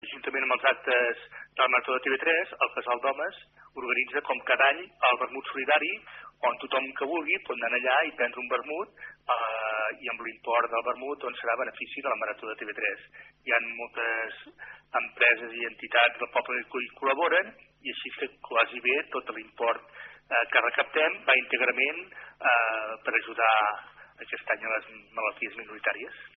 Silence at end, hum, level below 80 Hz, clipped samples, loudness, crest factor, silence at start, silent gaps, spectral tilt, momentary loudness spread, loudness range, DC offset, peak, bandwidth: 0.1 s; none; -72 dBFS; under 0.1%; -27 LUFS; 22 dB; 0.05 s; none; 2 dB/octave; 14 LU; 5 LU; under 0.1%; -6 dBFS; 4.1 kHz